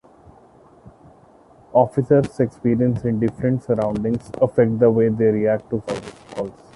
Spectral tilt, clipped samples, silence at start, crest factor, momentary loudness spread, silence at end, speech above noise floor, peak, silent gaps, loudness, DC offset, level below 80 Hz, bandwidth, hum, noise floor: -9 dB/octave; under 0.1%; 0.85 s; 18 dB; 13 LU; 0.25 s; 31 dB; -4 dBFS; none; -20 LUFS; under 0.1%; -50 dBFS; 11.5 kHz; none; -50 dBFS